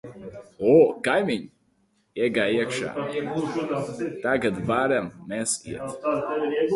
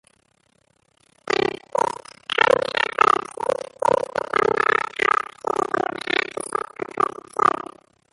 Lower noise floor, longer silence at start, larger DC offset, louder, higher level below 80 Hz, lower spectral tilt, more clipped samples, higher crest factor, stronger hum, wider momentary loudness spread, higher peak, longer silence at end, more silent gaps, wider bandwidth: about the same, -67 dBFS vs -64 dBFS; second, 0.05 s vs 1.25 s; neither; second, -25 LUFS vs -22 LUFS; about the same, -60 dBFS vs -60 dBFS; first, -4.5 dB/octave vs -3 dB/octave; neither; about the same, 20 dB vs 22 dB; neither; first, 12 LU vs 9 LU; second, -6 dBFS vs -2 dBFS; second, 0 s vs 0.5 s; neither; about the same, 11.5 kHz vs 11.5 kHz